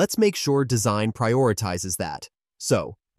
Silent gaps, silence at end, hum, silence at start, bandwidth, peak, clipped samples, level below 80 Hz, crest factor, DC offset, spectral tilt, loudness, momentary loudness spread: none; 0.25 s; none; 0 s; 15.5 kHz; -8 dBFS; under 0.1%; -54 dBFS; 16 dB; under 0.1%; -5 dB/octave; -23 LUFS; 9 LU